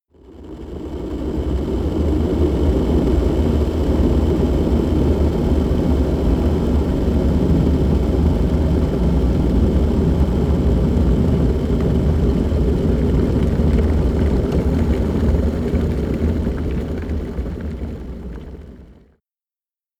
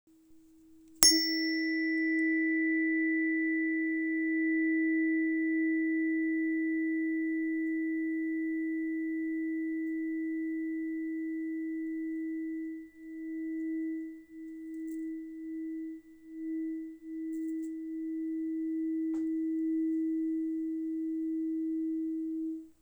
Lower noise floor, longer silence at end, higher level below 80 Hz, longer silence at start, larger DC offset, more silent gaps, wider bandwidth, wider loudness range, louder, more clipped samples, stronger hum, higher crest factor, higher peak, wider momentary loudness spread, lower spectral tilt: first, under -90 dBFS vs -59 dBFS; first, 1.1 s vs 0.1 s; first, -20 dBFS vs -70 dBFS; about the same, 0.3 s vs 0.3 s; neither; neither; second, 8.4 kHz vs over 20 kHz; second, 5 LU vs 11 LU; first, -18 LUFS vs -32 LUFS; neither; neither; second, 12 dB vs 32 dB; second, -6 dBFS vs 0 dBFS; about the same, 10 LU vs 12 LU; first, -9 dB/octave vs -1 dB/octave